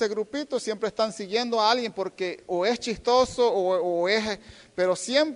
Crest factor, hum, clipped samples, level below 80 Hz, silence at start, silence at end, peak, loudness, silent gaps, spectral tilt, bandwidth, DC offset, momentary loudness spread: 18 dB; none; under 0.1%; -58 dBFS; 0 s; 0 s; -8 dBFS; -25 LUFS; none; -3.5 dB/octave; 10.5 kHz; under 0.1%; 8 LU